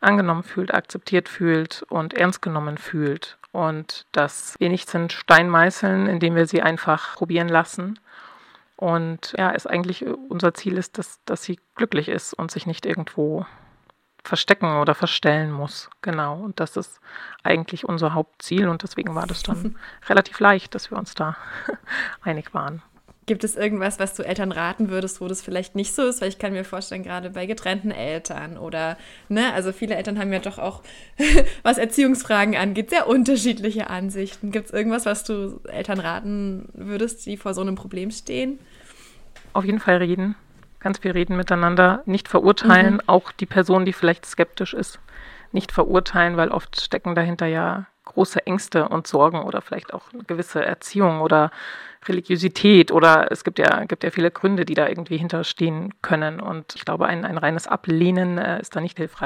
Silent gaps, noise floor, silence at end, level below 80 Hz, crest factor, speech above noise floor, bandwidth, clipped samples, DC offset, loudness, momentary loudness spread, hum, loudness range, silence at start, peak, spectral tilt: none; -58 dBFS; 0 s; -38 dBFS; 22 dB; 37 dB; 15.5 kHz; under 0.1%; under 0.1%; -21 LUFS; 13 LU; none; 9 LU; 0 s; 0 dBFS; -5 dB/octave